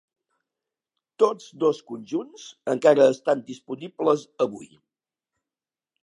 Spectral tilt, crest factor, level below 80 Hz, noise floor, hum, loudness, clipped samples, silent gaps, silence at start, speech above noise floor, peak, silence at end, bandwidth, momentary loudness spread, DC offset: -5.5 dB/octave; 22 dB; -80 dBFS; under -90 dBFS; none; -23 LUFS; under 0.1%; none; 1.2 s; over 67 dB; -4 dBFS; 1.4 s; 11 kHz; 17 LU; under 0.1%